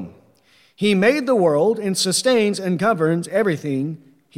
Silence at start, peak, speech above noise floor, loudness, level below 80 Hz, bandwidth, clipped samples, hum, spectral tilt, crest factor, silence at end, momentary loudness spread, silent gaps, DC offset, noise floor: 0 s; -4 dBFS; 38 dB; -19 LUFS; -66 dBFS; 16 kHz; under 0.1%; none; -4.5 dB/octave; 16 dB; 0.4 s; 8 LU; none; under 0.1%; -56 dBFS